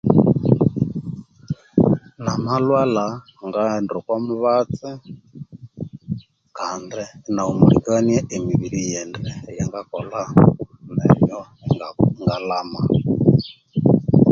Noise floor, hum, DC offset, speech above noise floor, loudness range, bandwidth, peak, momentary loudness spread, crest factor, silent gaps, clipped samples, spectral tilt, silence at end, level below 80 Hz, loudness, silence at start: -38 dBFS; none; under 0.1%; 19 dB; 5 LU; 7.4 kHz; 0 dBFS; 16 LU; 18 dB; none; under 0.1%; -7.5 dB/octave; 0 s; -44 dBFS; -20 LUFS; 0.05 s